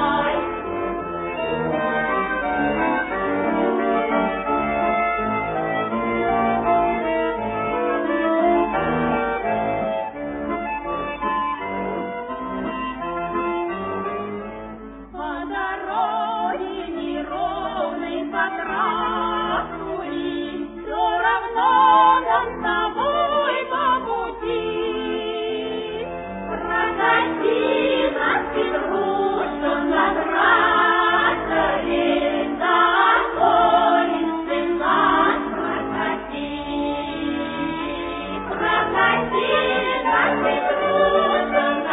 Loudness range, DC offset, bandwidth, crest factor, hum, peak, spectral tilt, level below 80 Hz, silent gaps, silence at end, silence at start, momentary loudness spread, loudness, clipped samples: 8 LU; under 0.1%; 4 kHz; 16 dB; none; -4 dBFS; -8.5 dB/octave; -46 dBFS; none; 0 s; 0 s; 11 LU; -21 LUFS; under 0.1%